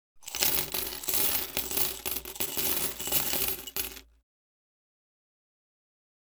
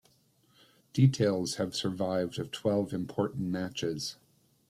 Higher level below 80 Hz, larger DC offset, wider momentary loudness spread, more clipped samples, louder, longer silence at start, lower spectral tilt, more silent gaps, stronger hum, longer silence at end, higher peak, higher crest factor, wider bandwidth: first, -54 dBFS vs -66 dBFS; neither; about the same, 9 LU vs 9 LU; neither; first, -28 LUFS vs -31 LUFS; second, 0.15 s vs 0.95 s; second, -0.5 dB/octave vs -6 dB/octave; neither; neither; first, 2.25 s vs 0.55 s; first, -4 dBFS vs -10 dBFS; first, 28 dB vs 20 dB; first, over 20 kHz vs 14 kHz